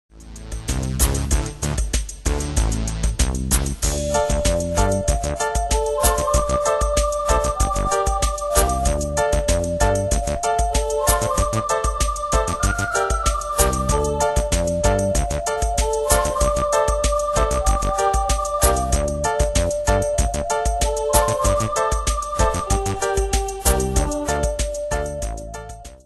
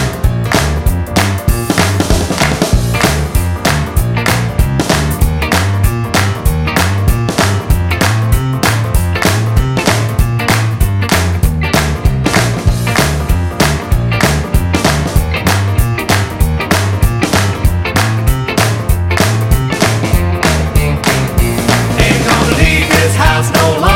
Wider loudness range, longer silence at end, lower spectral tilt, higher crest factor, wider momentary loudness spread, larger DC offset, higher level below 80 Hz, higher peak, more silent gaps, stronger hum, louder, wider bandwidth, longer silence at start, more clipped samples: about the same, 2 LU vs 2 LU; about the same, 0.1 s vs 0 s; about the same, -4 dB/octave vs -5 dB/octave; first, 20 dB vs 12 dB; about the same, 5 LU vs 4 LU; neither; second, -24 dBFS vs -18 dBFS; about the same, 0 dBFS vs 0 dBFS; neither; neither; second, -21 LUFS vs -12 LUFS; second, 12.5 kHz vs 17 kHz; first, 0.15 s vs 0 s; neither